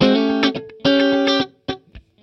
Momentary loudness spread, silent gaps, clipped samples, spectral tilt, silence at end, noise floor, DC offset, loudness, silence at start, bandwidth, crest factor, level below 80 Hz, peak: 15 LU; none; under 0.1%; -6 dB/octave; 0.25 s; -39 dBFS; under 0.1%; -18 LUFS; 0 s; 6.8 kHz; 16 dB; -50 dBFS; -2 dBFS